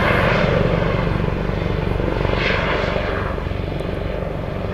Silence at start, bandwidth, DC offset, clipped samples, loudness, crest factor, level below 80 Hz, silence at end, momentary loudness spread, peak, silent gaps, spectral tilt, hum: 0 s; 13 kHz; under 0.1%; under 0.1%; -20 LUFS; 16 dB; -28 dBFS; 0 s; 8 LU; -4 dBFS; none; -7 dB/octave; none